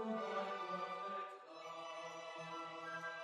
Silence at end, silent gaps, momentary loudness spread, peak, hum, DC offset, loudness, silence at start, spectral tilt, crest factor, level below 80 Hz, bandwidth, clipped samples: 0 s; none; 8 LU; -32 dBFS; none; under 0.1%; -46 LUFS; 0 s; -4 dB/octave; 14 dB; under -90 dBFS; 12.5 kHz; under 0.1%